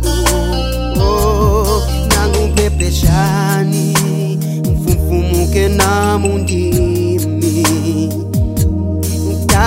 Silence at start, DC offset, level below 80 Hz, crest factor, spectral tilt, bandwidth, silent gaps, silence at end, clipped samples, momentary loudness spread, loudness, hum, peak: 0 s; under 0.1%; -18 dBFS; 12 dB; -5.5 dB/octave; 16.5 kHz; none; 0 s; under 0.1%; 5 LU; -14 LUFS; none; 0 dBFS